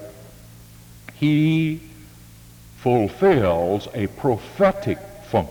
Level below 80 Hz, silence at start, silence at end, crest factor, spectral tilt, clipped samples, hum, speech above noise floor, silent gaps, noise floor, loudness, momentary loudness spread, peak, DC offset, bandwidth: -48 dBFS; 0 s; 0 s; 16 dB; -7.5 dB/octave; under 0.1%; none; 25 dB; none; -45 dBFS; -21 LUFS; 13 LU; -6 dBFS; under 0.1%; over 20 kHz